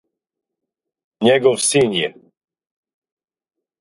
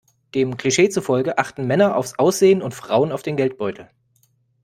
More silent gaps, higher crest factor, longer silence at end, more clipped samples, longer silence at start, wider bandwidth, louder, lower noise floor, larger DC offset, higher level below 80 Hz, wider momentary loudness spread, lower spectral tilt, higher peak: neither; about the same, 20 dB vs 18 dB; first, 1.7 s vs 0.8 s; neither; first, 1.2 s vs 0.35 s; second, 11.5 kHz vs 15.5 kHz; first, -16 LUFS vs -19 LUFS; first, -84 dBFS vs -62 dBFS; neither; about the same, -62 dBFS vs -60 dBFS; about the same, 8 LU vs 8 LU; second, -3.5 dB/octave vs -5 dB/octave; about the same, -2 dBFS vs 0 dBFS